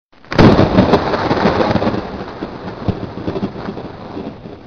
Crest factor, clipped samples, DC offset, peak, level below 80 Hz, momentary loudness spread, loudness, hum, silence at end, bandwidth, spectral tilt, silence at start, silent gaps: 16 dB; under 0.1%; under 0.1%; 0 dBFS; -32 dBFS; 18 LU; -15 LUFS; none; 0 s; 7 kHz; -7.5 dB/octave; 0.3 s; none